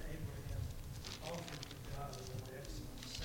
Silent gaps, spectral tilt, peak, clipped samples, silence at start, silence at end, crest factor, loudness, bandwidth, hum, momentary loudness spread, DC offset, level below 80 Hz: none; -4.5 dB/octave; -28 dBFS; under 0.1%; 0 s; 0 s; 18 dB; -47 LUFS; 17 kHz; none; 3 LU; under 0.1%; -52 dBFS